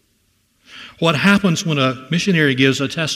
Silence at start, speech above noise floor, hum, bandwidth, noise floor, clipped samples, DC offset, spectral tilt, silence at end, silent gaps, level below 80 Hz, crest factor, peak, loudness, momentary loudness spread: 0.7 s; 46 dB; none; 15.5 kHz; -62 dBFS; under 0.1%; under 0.1%; -5 dB/octave; 0 s; none; -56 dBFS; 18 dB; 0 dBFS; -16 LUFS; 6 LU